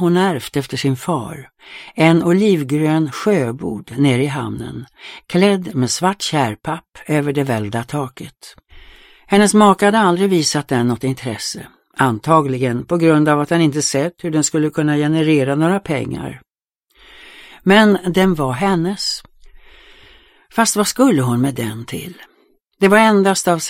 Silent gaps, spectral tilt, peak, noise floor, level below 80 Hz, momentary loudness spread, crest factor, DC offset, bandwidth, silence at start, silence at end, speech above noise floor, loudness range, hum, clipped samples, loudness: none; -5 dB/octave; 0 dBFS; -69 dBFS; -50 dBFS; 16 LU; 16 dB; under 0.1%; 16.5 kHz; 0 s; 0 s; 53 dB; 4 LU; none; under 0.1%; -16 LUFS